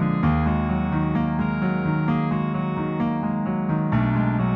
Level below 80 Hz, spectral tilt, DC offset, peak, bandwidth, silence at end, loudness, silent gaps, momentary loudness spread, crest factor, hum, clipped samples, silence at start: -38 dBFS; -11 dB/octave; under 0.1%; -10 dBFS; 4.9 kHz; 0 s; -23 LUFS; none; 4 LU; 12 dB; none; under 0.1%; 0 s